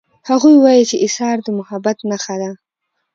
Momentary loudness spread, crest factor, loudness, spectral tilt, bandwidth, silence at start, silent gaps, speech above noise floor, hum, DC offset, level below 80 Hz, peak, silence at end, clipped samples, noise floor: 14 LU; 14 dB; -14 LUFS; -4.5 dB/octave; 7.8 kHz; 0.25 s; none; 60 dB; none; under 0.1%; -64 dBFS; 0 dBFS; 0.6 s; under 0.1%; -73 dBFS